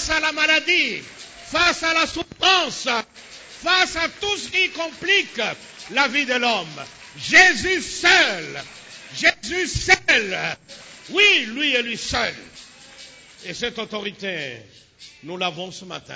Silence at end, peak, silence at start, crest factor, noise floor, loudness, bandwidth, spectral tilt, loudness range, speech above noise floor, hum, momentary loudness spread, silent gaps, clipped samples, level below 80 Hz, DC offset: 0 s; -2 dBFS; 0 s; 20 dB; -44 dBFS; -19 LUFS; 8 kHz; -1.5 dB/octave; 10 LU; 23 dB; none; 21 LU; none; under 0.1%; -48 dBFS; under 0.1%